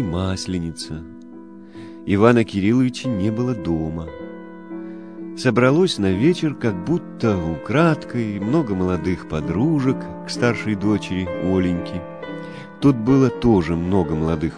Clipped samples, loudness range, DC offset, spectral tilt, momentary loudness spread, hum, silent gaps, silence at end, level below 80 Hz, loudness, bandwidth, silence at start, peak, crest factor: under 0.1%; 3 LU; 0.3%; -7 dB/octave; 18 LU; none; none; 0 s; -44 dBFS; -20 LUFS; 10.5 kHz; 0 s; -2 dBFS; 18 dB